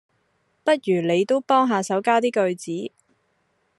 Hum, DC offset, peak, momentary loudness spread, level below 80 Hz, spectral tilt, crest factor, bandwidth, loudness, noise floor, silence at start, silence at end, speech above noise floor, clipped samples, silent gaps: none; under 0.1%; -6 dBFS; 11 LU; -74 dBFS; -5 dB/octave; 18 dB; 12 kHz; -21 LUFS; -68 dBFS; 0.65 s; 0.9 s; 48 dB; under 0.1%; none